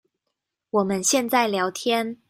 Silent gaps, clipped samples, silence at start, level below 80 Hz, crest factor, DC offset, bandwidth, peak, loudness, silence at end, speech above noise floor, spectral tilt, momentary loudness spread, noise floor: none; under 0.1%; 0.75 s; -66 dBFS; 18 dB; under 0.1%; 16 kHz; -6 dBFS; -22 LUFS; 0.15 s; 59 dB; -3 dB/octave; 5 LU; -81 dBFS